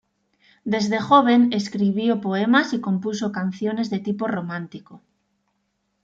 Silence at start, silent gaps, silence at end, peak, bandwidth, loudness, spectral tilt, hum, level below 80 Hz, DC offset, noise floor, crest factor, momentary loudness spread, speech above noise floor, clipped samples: 0.65 s; none; 1.05 s; -4 dBFS; 7.8 kHz; -21 LUFS; -6 dB/octave; none; -68 dBFS; under 0.1%; -72 dBFS; 18 dB; 13 LU; 51 dB; under 0.1%